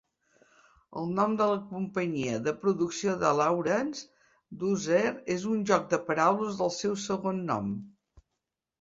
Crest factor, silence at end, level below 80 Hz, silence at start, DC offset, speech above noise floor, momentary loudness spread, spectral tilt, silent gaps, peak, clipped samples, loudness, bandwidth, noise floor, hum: 20 dB; 0.9 s; -66 dBFS; 0.9 s; under 0.1%; 57 dB; 9 LU; -5.5 dB/octave; none; -8 dBFS; under 0.1%; -29 LUFS; 7.8 kHz; -85 dBFS; none